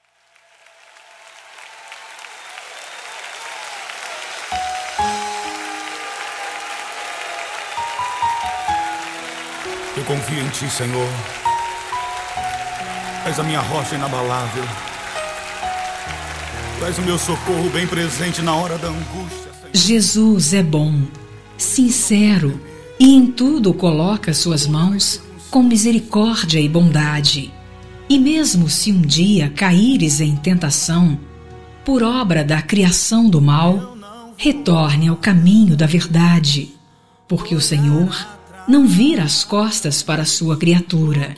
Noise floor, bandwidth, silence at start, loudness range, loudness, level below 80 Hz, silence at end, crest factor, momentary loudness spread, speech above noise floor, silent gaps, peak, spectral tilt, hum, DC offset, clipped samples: -56 dBFS; 11 kHz; 0.85 s; 11 LU; -16 LUFS; -44 dBFS; 0 s; 16 dB; 15 LU; 41 dB; none; 0 dBFS; -4.5 dB/octave; none; under 0.1%; under 0.1%